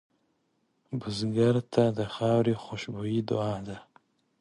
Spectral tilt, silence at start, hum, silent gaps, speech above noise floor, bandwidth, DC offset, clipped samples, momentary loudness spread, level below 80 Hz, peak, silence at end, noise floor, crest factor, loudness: -7 dB/octave; 0.9 s; none; none; 46 dB; 11 kHz; under 0.1%; under 0.1%; 12 LU; -62 dBFS; -10 dBFS; 0.6 s; -74 dBFS; 20 dB; -29 LUFS